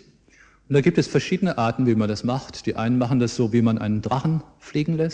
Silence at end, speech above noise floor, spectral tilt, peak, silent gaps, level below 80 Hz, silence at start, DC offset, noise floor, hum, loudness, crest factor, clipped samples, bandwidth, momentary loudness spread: 0 s; 33 dB; -7 dB/octave; -6 dBFS; none; -50 dBFS; 0.7 s; under 0.1%; -54 dBFS; none; -22 LUFS; 16 dB; under 0.1%; 9.4 kHz; 7 LU